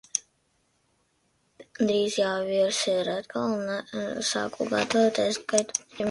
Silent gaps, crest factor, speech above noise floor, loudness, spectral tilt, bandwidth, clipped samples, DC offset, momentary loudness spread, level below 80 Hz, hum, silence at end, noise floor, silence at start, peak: none; 24 dB; 44 dB; -27 LUFS; -3 dB/octave; 11.5 kHz; under 0.1%; under 0.1%; 8 LU; -68 dBFS; none; 0 s; -70 dBFS; 0.15 s; -4 dBFS